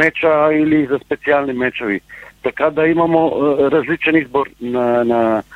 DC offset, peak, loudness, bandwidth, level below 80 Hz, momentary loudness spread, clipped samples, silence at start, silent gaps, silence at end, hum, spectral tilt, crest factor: under 0.1%; 0 dBFS; -16 LUFS; 7.4 kHz; -50 dBFS; 8 LU; under 0.1%; 0 s; none; 0 s; none; -7.5 dB/octave; 14 dB